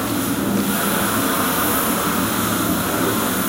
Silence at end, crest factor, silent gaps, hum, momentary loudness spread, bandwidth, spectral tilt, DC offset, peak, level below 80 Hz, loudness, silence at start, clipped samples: 0 s; 14 dB; none; none; 2 LU; 16 kHz; -3.5 dB/octave; under 0.1%; -6 dBFS; -44 dBFS; -19 LUFS; 0 s; under 0.1%